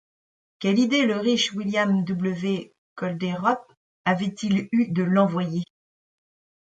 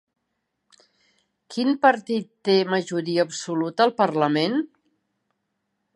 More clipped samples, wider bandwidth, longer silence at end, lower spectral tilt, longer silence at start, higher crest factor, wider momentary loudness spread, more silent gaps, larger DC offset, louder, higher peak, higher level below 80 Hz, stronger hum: neither; second, 9 kHz vs 11.5 kHz; second, 0.95 s vs 1.3 s; about the same, -5.5 dB/octave vs -5 dB/octave; second, 0.6 s vs 1.5 s; about the same, 18 dB vs 22 dB; about the same, 10 LU vs 8 LU; first, 2.78-2.96 s, 3.77-4.04 s vs none; neither; about the same, -24 LUFS vs -22 LUFS; second, -8 dBFS vs -4 dBFS; first, -68 dBFS vs -78 dBFS; neither